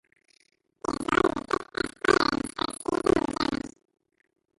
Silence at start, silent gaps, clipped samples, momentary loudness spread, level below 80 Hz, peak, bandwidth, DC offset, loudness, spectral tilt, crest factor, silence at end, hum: 0.9 s; none; under 0.1%; 10 LU; -52 dBFS; -6 dBFS; 11.5 kHz; under 0.1%; -27 LUFS; -4 dB/octave; 22 dB; 0.9 s; none